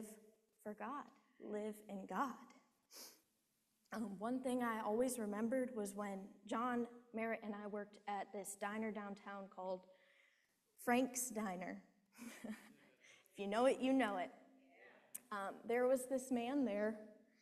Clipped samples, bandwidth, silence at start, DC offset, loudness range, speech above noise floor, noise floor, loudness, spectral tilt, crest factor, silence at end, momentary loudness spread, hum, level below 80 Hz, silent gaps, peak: under 0.1%; 14.5 kHz; 0 s; under 0.1%; 8 LU; 41 dB; -84 dBFS; -43 LUFS; -4.5 dB/octave; 20 dB; 0.3 s; 18 LU; none; -84 dBFS; none; -24 dBFS